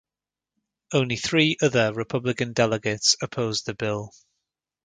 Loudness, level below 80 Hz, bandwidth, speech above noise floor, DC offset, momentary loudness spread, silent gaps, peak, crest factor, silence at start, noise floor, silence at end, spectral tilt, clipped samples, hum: -23 LUFS; -60 dBFS; 9.6 kHz; 66 dB; under 0.1%; 8 LU; none; -4 dBFS; 20 dB; 0.9 s; -90 dBFS; 0.8 s; -3.5 dB/octave; under 0.1%; none